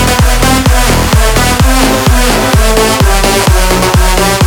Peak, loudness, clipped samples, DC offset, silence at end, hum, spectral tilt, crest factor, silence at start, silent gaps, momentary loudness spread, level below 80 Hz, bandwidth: 0 dBFS; -8 LUFS; 0.4%; under 0.1%; 0 s; none; -4 dB/octave; 6 dB; 0 s; none; 1 LU; -12 dBFS; over 20 kHz